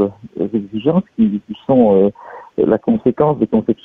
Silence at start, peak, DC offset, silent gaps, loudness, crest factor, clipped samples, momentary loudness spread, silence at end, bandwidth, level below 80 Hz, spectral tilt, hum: 0 s; -2 dBFS; under 0.1%; none; -16 LUFS; 14 dB; under 0.1%; 11 LU; 0.1 s; 3.8 kHz; -50 dBFS; -11 dB/octave; none